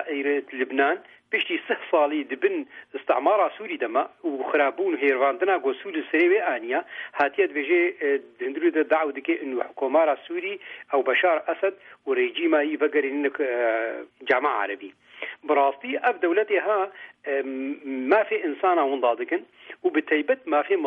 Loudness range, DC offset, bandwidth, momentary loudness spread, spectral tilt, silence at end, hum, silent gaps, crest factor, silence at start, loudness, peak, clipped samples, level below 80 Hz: 2 LU; under 0.1%; 4.7 kHz; 9 LU; -5.5 dB/octave; 0 s; none; none; 16 dB; 0 s; -24 LUFS; -8 dBFS; under 0.1%; -80 dBFS